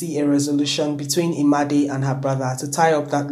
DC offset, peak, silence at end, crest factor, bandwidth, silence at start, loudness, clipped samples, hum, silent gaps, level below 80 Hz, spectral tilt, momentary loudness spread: under 0.1%; -2 dBFS; 0 s; 16 dB; 15.5 kHz; 0 s; -20 LUFS; under 0.1%; none; none; -66 dBFS; -5 dB/octave; 5 LU